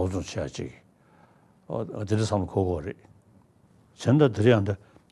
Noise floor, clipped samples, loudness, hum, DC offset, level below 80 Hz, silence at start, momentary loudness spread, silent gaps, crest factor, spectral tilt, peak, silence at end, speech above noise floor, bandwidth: -59 dBFS; under 0.1%; -26 LUFS; none; under 0.1%; -58 dBFS; 0 s; 17 LU; none; 20 dB; -7 dB/octave; -6 dBFS; 0.35 s; 34 dB; 12 kHz